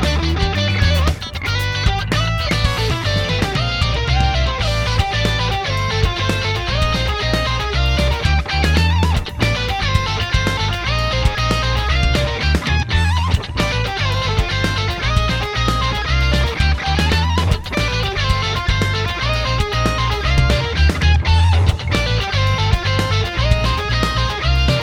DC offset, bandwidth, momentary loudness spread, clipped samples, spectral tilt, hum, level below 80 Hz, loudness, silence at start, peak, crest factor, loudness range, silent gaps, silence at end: under 0.1%; 16.5 kHz; 3 LU; under 0.1%; -5 dB/octave; none; -22 dBFS; -17 LUFS; 0 s; 0 dBFS; 16 dB; 2 LU; none; 0 s